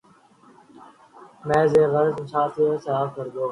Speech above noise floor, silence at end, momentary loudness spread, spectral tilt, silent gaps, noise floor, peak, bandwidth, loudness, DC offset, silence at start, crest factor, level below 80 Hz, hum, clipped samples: 33 dB; 0 s; 11 LU; -7.5 dB/octave; none; -54 dBFS; -6 dBFS; 10.5 kHz; -22 LUFS; under 0.1%; 1.2 s; 18 dB; -60 dBFS; none; under 0.1%